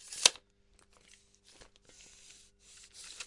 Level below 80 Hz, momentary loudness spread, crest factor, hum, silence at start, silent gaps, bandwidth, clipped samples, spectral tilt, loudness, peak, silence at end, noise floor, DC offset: -70 dBFS; 29 LU; 36 dB; 50 Hz at -75 dBFS; 0.1 s; none; 11.5 kHz; under 0.1%; 2.5 dB/octave; -27 LUFS; -4 dBFS; 0 s; -67 dBFS; under 0.1%